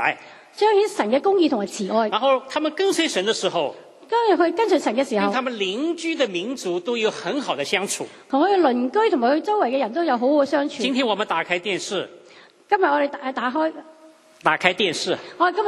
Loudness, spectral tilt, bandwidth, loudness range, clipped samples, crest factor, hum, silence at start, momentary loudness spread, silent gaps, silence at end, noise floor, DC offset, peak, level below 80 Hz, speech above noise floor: -21 LUFS; -3.5 dB/octave; 13 kHz; 3 LU; under 0.1%; 22 dB; none; 0 s; 7 LU; none; 0 s; -49 dBFS; under 0.1%; 0 dBFS; -74 dBFS; 28 dB